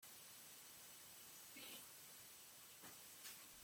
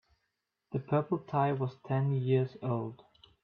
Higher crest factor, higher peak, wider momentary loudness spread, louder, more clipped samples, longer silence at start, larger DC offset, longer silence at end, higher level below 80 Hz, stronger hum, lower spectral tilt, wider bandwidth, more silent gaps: about the same, 18 dB vs 18 dB; second, -42 dBFS vs -16 dBFS; second, 3 LU vs 9 LU; second, -57 LUFS vs -32 LUFS; neither; second, 0 s vs 0.7 s; neither; second, 0 s vs 0.5 s; second, -90 dBFS vs -72 dBFS; neither; second, -0.5 dB/octave vs -10.5 dB/octave; first, 17 kHz vs 4.9 kHz; neither